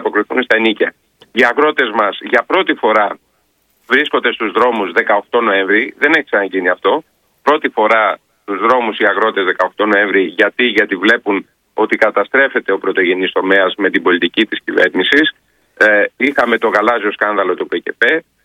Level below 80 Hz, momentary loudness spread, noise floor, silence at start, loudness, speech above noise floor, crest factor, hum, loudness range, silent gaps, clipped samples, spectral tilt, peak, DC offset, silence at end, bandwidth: -62 dBFS; 6 LU; -60 dBFS; 0 s; -13 LUFS; 46 dB; 14 dB; none; 2 LU; none; 0.1%; -4.5 dB/octave; 0 dBFS; under 0.1%; 0.25 s; 12.5 kHz